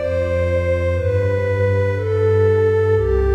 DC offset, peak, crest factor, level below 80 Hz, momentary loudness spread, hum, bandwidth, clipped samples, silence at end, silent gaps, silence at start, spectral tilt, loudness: under 0.1%; -4 dBFS; 12 dB; -30 dBFS; 4 LU; none; 7.2 kHz; under 0.1%; 0 s; none; 0 s; -8.5 dB/octave; -18 LUFS